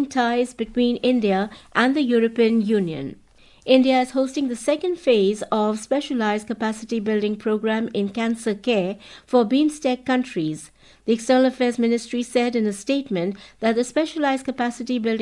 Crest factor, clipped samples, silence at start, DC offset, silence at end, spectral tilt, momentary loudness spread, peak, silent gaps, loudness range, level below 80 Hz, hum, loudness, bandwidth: 18 dB; under 0.1%; 0 s; under 0.1%; 0 s; -5 dB/octave; 8 LU; -4 dBFS; none; 3 LU; -58 dBFS; none; -22 LUFS; 11.5 kHz